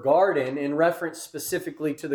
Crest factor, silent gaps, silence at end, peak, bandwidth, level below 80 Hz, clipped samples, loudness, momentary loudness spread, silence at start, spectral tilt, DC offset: 16 dB; none; 0 s; -8 dBFS; 19 kHz; -70 dBFS; under 0.1%; -25 LUFS; 12 LU; 0 s; -5 dB/octave; under 0.1%